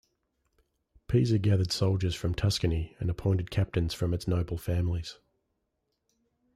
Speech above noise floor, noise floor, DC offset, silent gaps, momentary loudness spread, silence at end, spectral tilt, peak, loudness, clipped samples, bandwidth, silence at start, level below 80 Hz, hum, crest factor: 52 dB; -80 dBFS; under 0.1%; none; 6 LU; 1.45 s; -6.5 dB/octave; -14 dBFS; -29 LUFS; under 0.1%; 14 kHz; 1.1 s; -46 dBFS; none; 16 dB